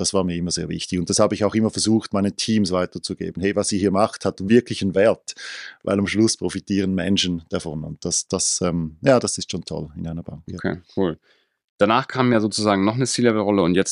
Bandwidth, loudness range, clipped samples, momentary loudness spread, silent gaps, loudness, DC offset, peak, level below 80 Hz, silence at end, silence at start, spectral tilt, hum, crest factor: 11.5 kHz; 3 LU; under 0.1%; 11 LU; 11.64-11.78 s; -21 LUFS; under 0.1%; -2 dBFS; -52 dBFS; 0 s; 0 s; -4.5 dB/octave; none; 20 dB